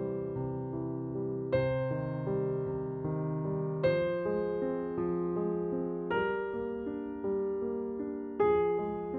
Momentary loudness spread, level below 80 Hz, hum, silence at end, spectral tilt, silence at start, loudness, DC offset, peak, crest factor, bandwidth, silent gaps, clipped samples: 7 LU; -58 dBFS; none; 0 s; -11 dB/octave; 0 s; -33 LUFS; under 0.1%; -16 dBFS; 16 dB; 4.6 kHz; none; under 0.1%